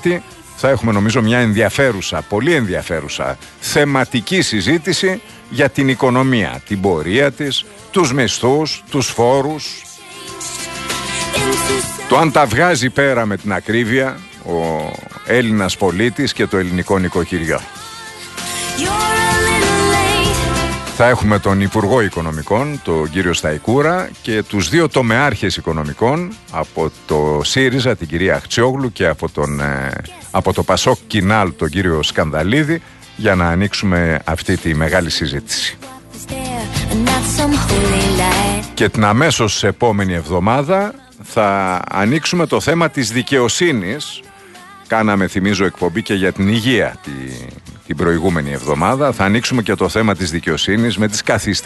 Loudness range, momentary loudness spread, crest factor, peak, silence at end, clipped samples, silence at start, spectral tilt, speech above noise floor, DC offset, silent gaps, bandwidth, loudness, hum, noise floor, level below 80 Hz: 3 LU; 10 LU; 16 dB; 0 dBFS; 0 s; under 0.1%; 0 s; -4.5 dB/octave; 23 dB; under 0.1%; none; 12.5 kHz; -15 LUFS; none; -39 dBFS; -34 dBFS